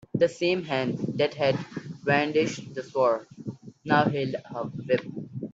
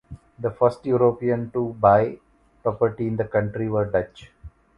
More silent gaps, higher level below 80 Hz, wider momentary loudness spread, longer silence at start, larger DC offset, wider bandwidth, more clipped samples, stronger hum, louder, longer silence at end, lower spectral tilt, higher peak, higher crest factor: neither; second, -66 dBFS vs -50 dBFS; first, 14 LU vs 11 LU; about the same, 0.15 s vs 0.1 s; neither; first, 8 kHz vs 7.2 kHz; neither; neither; second, -27 LUFS vs -23 LUFS; second, 0 s vs 0.3 s; second, -6 dB/octave vs -9.5 dB/octave; second, -8 dBFS vs -2 dBFS; about the same, 20 dB vs 20 dB